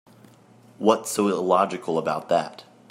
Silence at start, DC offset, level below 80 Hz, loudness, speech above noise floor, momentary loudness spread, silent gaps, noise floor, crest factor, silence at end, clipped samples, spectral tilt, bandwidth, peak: 0.8 s; under 0.1%; -74 dBFS; -23 LUFS; 30 dB; 5 LU; none; -52 dBFS; 22 dB; 0.3 s; under 0.1%; -4.5 dB/octave; 16 kHz; -4 dBFS